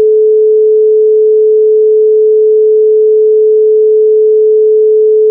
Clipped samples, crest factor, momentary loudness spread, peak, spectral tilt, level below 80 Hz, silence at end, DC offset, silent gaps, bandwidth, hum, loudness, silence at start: under 0.1%; 4 dB; 0 LU; -2 dBFS; -11.5 dB/octave; -86 dBFS; 0 s; under 0.1%; none; 0.6 kHz; none; -7 LUFS; 0 s